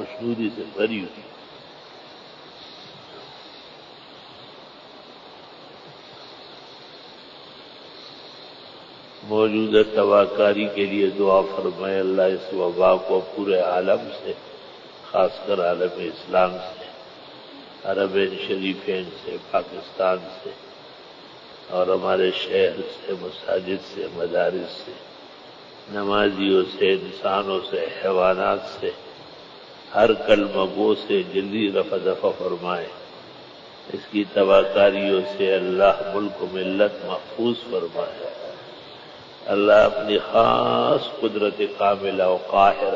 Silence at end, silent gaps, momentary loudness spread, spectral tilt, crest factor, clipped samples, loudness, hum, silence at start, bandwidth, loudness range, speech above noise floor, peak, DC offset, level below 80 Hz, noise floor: 0 s; none; 24 LU; -6.5 dB/octave; 20 dB; under 0.1%; -22 LUFS; none; 0 s; 7.6 kHz; 21 LU; 23 dB; -2 dBFS; under 0.1%; -58 dBFS; -44 dBFS